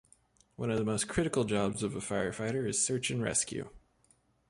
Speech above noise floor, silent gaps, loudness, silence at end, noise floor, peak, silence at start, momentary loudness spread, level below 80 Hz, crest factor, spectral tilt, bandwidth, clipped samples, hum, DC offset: 37 dB; none; -32 LUFS; 0.7 s; -69 dBFS; -16 dBFS; 0.6 s; 7 LU; -58 dBFS; 18 dB; -4 dB/octave; 11.5 kHz; under 0.1%; none; under 0.1%